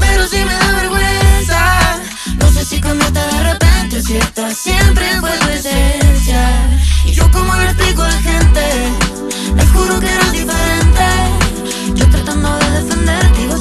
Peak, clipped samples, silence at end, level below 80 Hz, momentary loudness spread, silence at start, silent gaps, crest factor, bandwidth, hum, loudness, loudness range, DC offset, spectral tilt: 0 dBFS; under 0.1%; 0 s; -14 dBFS; 5 LU; 0 s; none; 10 dB; 14.5 kHz; none; -12 LUFS; 1 LU; under 0.1%; -4.5 dB/octave